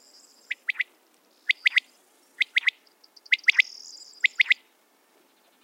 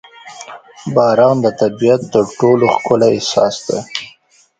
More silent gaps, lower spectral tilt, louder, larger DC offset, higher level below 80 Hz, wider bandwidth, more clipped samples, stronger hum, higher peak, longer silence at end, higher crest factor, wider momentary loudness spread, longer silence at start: neither; second, 4.5 dB/octave vs -5.5 dB/octave; second, -24 LUFS vs -13 LUFS; neither; second, under -90 dBFS vs -54 dBFS; first, 16.5 kHz vs 9.2 kHz; neither; neither; second, -6 dBFS vs 0 dBFS; first, 1.1 s vs 0.5 s; first, 24 dB vs 14 dB; second, 13 LU vs 21 LU; first, 0.5 s vs 0.25 s